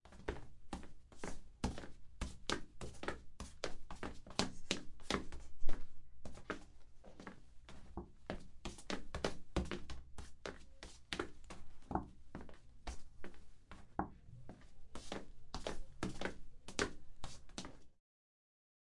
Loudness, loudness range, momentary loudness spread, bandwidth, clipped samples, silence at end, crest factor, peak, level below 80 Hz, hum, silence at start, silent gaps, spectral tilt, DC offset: -47 LUFS; 6 LU; 16 LU; 11.5 kHz; under 0.1%; 1.1 s; 30 dB; -12 dBFS; -52 dBFS; none; 0.05 s; none; -4 dB/octave; under 0.1%